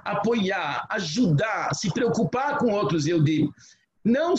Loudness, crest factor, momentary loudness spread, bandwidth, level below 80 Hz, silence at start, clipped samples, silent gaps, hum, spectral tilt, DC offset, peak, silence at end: -24 LUFS; 12 dB; 5 LU; 8.4 kHz; -58 dBFS; 0.05 s; under 0.1%; none; none; -6 dB/octave; under 0.1%; -12 dBFS; 0 s